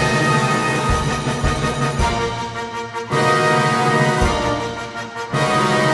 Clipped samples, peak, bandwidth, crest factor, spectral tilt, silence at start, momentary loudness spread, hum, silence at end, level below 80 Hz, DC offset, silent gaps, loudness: under 0.1%; -2 dBFS; 11.5 kHz; 16 dB; -5 dB/octave; 0 s; 10 LU; none; 0 s; -30 dBFS; under 0.1%; none; -18 LUFS